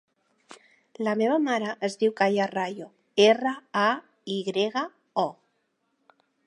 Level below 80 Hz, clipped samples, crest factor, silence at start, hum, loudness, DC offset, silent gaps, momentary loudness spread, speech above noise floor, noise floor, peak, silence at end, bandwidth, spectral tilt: -80 dBFS; under 0.1%; 22 dB; 0.5 s; none; -26 LUFS; under 0.1%; none; 11 LU; 49 dB; -74 dBFS; -6 dBFS; 1.15 s; 11 kHz; -4.5 dB/octave